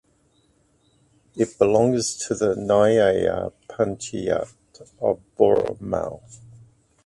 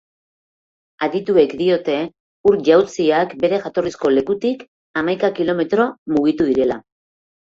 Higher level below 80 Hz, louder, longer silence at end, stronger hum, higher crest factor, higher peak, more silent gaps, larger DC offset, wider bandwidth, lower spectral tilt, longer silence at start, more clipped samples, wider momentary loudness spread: about the same, -52 dBFS vs -56 dBFS; second, -22 LUFS vs -18 LUFS; about the same, 0.7 s vs 0.65 s; neither; about the same, 22 dB vs 18 dB; about the same, -2 dBFS vs -2 dBFS; second, none vs 2.20-2.44 s, 4.68-4.94 s, 5.98-6.06 s; neither; first, 11.5 kHz vs 7.6 kHz; about the same, -5 dB/octave vs -6 dB/octave; first, 1.35 s vs 1 s; neither; first, 12 LU vs 9 LU